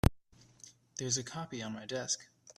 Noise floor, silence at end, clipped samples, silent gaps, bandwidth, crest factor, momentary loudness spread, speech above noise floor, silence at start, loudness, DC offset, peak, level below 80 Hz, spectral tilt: -61 dBFS; 0.05 s; under 0.1%; none; 14.5 kHz; 28 dB; 21 LU; 23 dB; 0.05 s; -37 LUFS; under 0.1%; -8 dBFS; -48 dBFS; -4 dB/octave